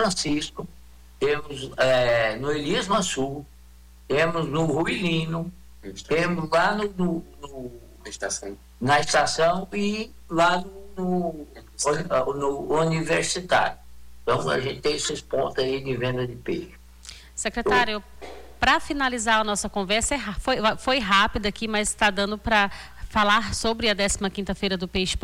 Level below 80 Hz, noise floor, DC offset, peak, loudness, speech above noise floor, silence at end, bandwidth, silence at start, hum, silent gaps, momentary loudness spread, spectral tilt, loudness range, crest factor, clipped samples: -44 dBFS; -49 dBFS; under 0.1%; -8 dBFS; -24 LUFS; 25 dB; 0.05 s; 18 kHz; 0 s; none; none; 18 LU; -3.5 dB/octave; 4 LU; 16 dB; under 0.1%